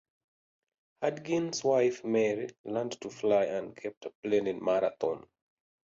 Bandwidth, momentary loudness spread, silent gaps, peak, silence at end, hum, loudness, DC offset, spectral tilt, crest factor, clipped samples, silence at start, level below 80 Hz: 7.8 kHz; 12 LU; 2.59-2.64 s, 3.97-4.01 s, 4.15-4.23 s; -14 dBFS; 0.65 s; none; -31 LUFS; under 0.1%; -5 dB/octave; 18 dB; under 0.1%; 1 s; -74 dBFS